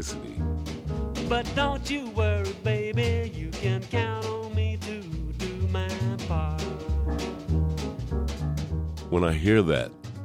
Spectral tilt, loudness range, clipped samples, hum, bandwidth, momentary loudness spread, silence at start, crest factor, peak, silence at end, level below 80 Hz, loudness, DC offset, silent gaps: -6.5 dB/octave; 3 LU; under 0.1%; none; 13.5 kHz; 8 LU; 0 s; 20 dB; -8 dBFS; 0 s; -34 dBFS; -28 LUFS; under 0.1%; none